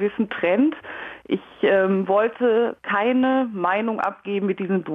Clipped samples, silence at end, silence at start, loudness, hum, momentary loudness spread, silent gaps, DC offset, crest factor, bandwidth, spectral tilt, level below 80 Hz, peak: under 0.1%; 0 s; 0 s; -21 LUFS; none; 9 LU; none; under 0.1%; 12 dB; 3.9 kHz; -8.5 dB/octave; -66 dBFS; -10 dBFS